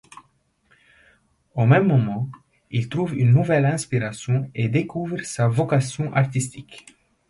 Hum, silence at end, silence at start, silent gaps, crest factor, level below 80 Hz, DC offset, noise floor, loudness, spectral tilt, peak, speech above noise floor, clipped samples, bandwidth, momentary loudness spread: none; 0.5 s; 1.55 s; none; 18 dB; -56 dBFS; under 0.1%; -64 dBFS; -22 LUFS; -7 dB/octave; -4 dBFS; 44 dB; under 0.1%; 11.5 kHz; 12 LU